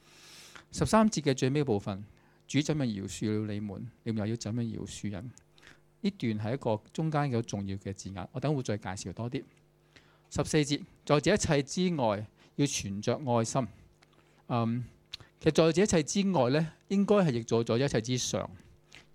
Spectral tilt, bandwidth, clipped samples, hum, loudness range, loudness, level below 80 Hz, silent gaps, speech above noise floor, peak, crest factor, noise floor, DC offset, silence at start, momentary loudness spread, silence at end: -5.5 dB/octave; 14.5 kHz; under 0.1%; none; 7 LU; -31 LUFS; -58 dBFS; none; 33 dB; -10 dBFS; 22 dB; -63 dBFS; under 0.1%; 0.25 s; 14 LU; 0.15 s